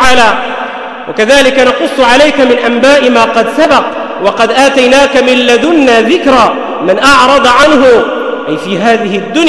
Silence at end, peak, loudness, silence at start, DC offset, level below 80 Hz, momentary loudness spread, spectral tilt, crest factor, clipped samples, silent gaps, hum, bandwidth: 0 s; 0 dBFS; -6 LUFS; 0 s; under 0.1%; -36 dBFS; 10 LU; -3.5 dB/octave; 6 dB; 1%; none; none; 12 kHz